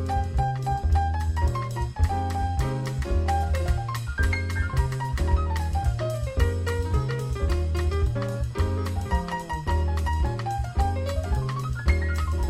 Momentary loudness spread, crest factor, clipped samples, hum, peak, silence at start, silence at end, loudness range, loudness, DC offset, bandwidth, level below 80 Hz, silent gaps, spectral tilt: 4 LU; 16 dB; under 0.1%; none; -8 dBFS; 0 s; 0 s; 1 LU; -27 LUFS; under 0.1%; 14 kHz; -28 dBFS; none; -6.5 dB/octave